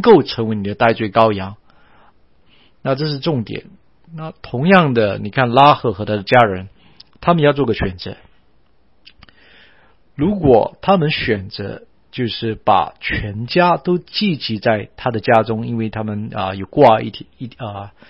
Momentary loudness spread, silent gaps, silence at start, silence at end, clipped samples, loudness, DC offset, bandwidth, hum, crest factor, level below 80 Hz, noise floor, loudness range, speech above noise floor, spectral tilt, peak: 17 LU; none; 0 s; 0.2 s; under 0.1%; -16 LUFS; 0.3%; 6 kHz; none; 18 dB; -44 dBFS; -58 dBFS; 6 LU; 42 dB; -8.5 dB/octave; 0 dBFS